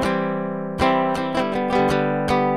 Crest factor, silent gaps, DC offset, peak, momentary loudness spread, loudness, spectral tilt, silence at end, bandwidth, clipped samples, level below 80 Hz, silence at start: 16 dB; none; 0.5%; -4 dBFS; 5 LU; -21 LUFS; -6.5 dB/octave; 0 s; 14.5 kHz; under 0.1%; -44 dBFS; 0 s